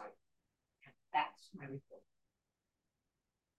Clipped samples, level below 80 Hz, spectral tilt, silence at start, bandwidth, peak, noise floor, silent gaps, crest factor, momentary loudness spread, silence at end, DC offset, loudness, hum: under 0.1%; -90 dBFS; -5 dB/octave; 0 s; 8.8 kHz; -22 dBFS; -90 dBFS; none; 26 dB; 23 LU; 1.6 s; under 0.1%; -42 LUFS; none